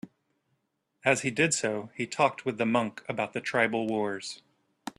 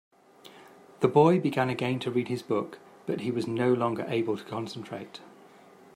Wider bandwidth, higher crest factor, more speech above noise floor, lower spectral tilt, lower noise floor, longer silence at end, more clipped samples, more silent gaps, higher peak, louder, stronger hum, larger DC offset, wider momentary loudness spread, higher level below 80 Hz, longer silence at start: second, 13 kHz vs 15.5 kHz; about the same, 22 dB vs 20 dB; first, 48 dB vs 27 dB; second, -4 dB/octave vs -7 dB/octave; first, -77 dBFS vs -54 dBFS; second, 0.1 s vs 0.65 s; neither; neither; about the same, -8 dBFS vs -8 dBFS; about the same, -28 LUFS vs -28 LUFS; neither; neither; second, 10 LU vs 18 LU; about the same, -72 dBFS vs -74 dBFS; second, 0.05 s vs 0.45 s